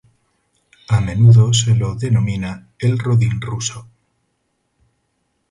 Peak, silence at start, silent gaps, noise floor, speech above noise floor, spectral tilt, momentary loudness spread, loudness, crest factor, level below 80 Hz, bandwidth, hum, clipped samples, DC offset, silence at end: -2 dBFS; 0.9 s; none; -68 dBFS; 54 dB; -5.5 dB/octave; 14 LU; -16 LUFS; 16 dB; -42 dBFS; 11 kHz; none; under 0.1%; under 0.1%; 1.65 s